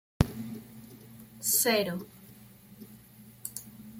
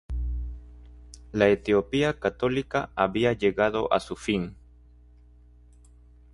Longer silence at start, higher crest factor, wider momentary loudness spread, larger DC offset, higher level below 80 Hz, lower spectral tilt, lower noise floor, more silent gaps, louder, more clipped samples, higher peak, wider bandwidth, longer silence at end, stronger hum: about the same, 0.2 s vs 0.1 s; first, 28 dB vs 20 dB; first, 26 LU vs 12 LU; neither; second, -48 dBFS vs -40 dBFS; second, -3.5 dB/octave vs -6 dB/octave; about the same, -53 dBFS vs -53 dBFS; neither; second, -29 LUFS vs -26 LUFS; neither; about the same, -6 dBFS vs -6 dBFS; first, 16.5 kHz vs 11.5 kHz; second, 0 s vs 1.8 s; second, none vs 60 Hz at -50 dBFS